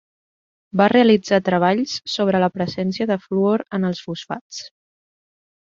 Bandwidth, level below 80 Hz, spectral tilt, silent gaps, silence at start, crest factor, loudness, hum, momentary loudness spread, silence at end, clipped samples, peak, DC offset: 7.6 kHz; -60 dBFS; -6 dB/octave; 4.41-4.50 s; 0.75 s; 18 dB; -19 LUFS; none; 15 LU; 0.95 s; under 0.1%; -2 dBFS; under 0.1%